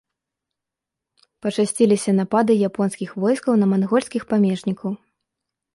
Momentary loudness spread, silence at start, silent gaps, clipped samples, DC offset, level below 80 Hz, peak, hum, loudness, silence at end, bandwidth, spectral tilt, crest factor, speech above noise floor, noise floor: 9 LU; 1.45 s; none; under 0.1%; under 0.1%; -64 dBFS; -4 dBFS; none; -20 LUFS; 0.8 s; 11.5 kHz; -6.5 dB/octave; 16 dB; 66 dB; -85 dBFS